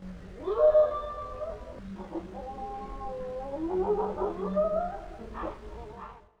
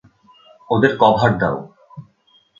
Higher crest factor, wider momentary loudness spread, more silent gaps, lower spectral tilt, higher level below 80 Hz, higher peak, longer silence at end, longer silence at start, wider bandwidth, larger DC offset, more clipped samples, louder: about the same, 18 dB vs 20 dB; first, 19 LU vs 14 LU; neither; about the same, -8 dB/octave vs -7.5 dB/octave; about the same, -48 dBFS vs -50 dBFS; second, -12 dBFS vs 0 dBFS; second, 0.2 s vs 0.6 s; second, 0 s vs 0.7 s; about the same, 7.4 kHz vs 7.4 kHz; neither; neither; second, -30 LUFS vs -17 LUFS